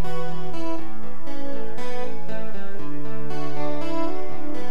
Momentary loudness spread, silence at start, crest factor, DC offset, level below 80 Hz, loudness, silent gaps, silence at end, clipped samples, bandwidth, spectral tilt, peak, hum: 7 LU; 0 s; 16 dB; 20%; -50 dBFS; -33 LUFS; none; 0 s; under 0.1%; 14 kHz; -7 dB/octave; -8 dBFS; none